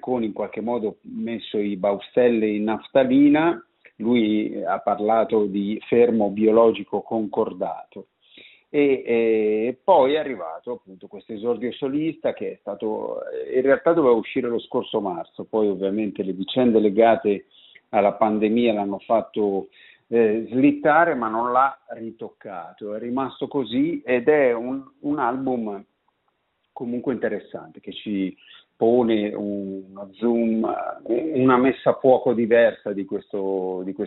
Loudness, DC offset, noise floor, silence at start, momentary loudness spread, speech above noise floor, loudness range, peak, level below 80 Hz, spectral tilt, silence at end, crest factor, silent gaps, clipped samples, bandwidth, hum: -22 LUFS; under 0.1%; -71 dBFS; 0.05 s; 14 LU; 50 dB; 5 LU; -4 dBFS; -64 dBFS; -5 dB/octave; 0 s; 18 dB; none; under 0.1%; 4.1 kHz; none